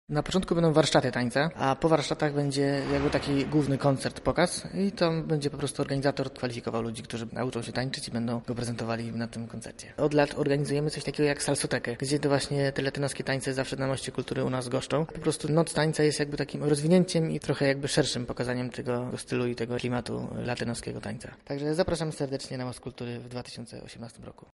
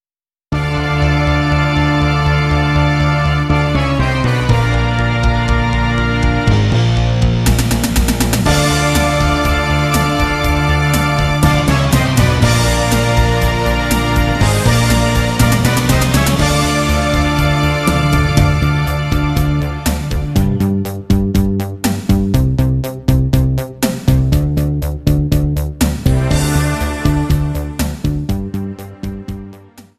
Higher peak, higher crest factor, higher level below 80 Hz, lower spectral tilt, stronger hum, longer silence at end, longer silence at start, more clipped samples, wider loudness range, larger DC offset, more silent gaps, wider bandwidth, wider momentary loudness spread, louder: second, -8 dBFS vs 0 dBFS; first, 20 dB vs 14 dB; second, -52 dBFS vs -20 dBFS; about the same, -5.5 dB/octave vs -5.5 dB/octave; neither; about the same, 0.2 s vs 0.15 s; second, 0.1 s vs 0.5 s; neither; first, 6 LU vs 3 LU; neither; neither; second, 11.5 kHz vs 14.5 kHz; first, 11 LU vs 6 LU; second, -29 LUFS vs -14 LUFS